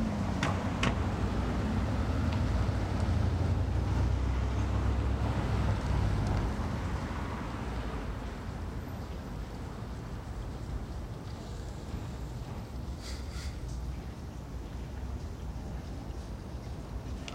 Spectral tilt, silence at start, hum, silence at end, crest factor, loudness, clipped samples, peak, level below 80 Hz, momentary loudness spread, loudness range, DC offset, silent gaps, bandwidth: -6.5 dB/octave; 0 s; none; 0 s; 20 dB; -35 LUFS; under 0.1%; -12 dBFS; -38 dBFS; 11 LU; 10 LU; under 0.1%; none; 14 kHz